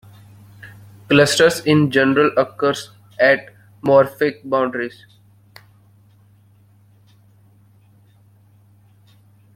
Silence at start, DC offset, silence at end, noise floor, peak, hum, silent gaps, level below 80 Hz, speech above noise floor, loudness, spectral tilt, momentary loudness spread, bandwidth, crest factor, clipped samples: 0.65 s; under 0.1%; 4.65 s; -52 dBFS; -2 dBFS; none; none; -58 dBFS; 36 dB; -17 LUFS; -5 dB/octave; 12 LU; 16 kHz; 18 dB; under 0.1%